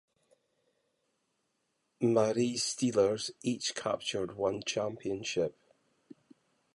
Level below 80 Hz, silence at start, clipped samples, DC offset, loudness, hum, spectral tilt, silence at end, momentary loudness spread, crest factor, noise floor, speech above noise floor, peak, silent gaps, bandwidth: -70 dBFS; 2 s; under 0.1%; under 0.1%; -32 LUFS; none; -4 dB/octave; 1.25 s; 7 LU; 20 dB; -80 dBFS; 48 dB; -14 dBFS; none; 11.5 kHz